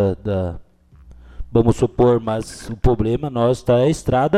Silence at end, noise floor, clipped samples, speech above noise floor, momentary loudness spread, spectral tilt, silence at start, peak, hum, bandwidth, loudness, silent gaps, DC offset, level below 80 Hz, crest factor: 0 s; -46 dBFS; under 0.1%; 29 dB; 9 LU; -7.5 dB/octave; 0 s; -4 dBFS; none; 13 kHz; -19 LUFS; none; under 0.1%; -32 dBFS; 16 dB